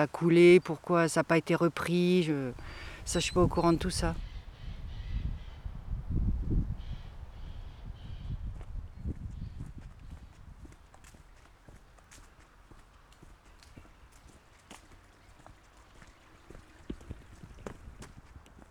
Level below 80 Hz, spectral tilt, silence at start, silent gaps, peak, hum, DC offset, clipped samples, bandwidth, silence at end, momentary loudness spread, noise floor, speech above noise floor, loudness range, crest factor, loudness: -42 dBFS; -6 dB/octave; 0 s; none; -10 dBFS; none; under 0.1%; under 0.1%; 13.5 kHz; 0.1 s; 24 LU; -57 dBFS; 31 dB; 23 LU; 22 dB; -29 LUFS